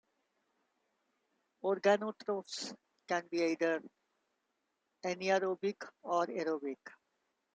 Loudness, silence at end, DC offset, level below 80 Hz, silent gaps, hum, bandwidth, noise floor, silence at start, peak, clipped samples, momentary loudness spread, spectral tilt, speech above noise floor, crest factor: -36 LUFS; 0.65 s; under 0.1%; -88 dBFS; none; none; 9.4 kHz; -84 dBFS; 1.65 s; -16 dBFS; under 0.1%; 13 LU; -4.5 dB/octave; 49 dB; 22 dB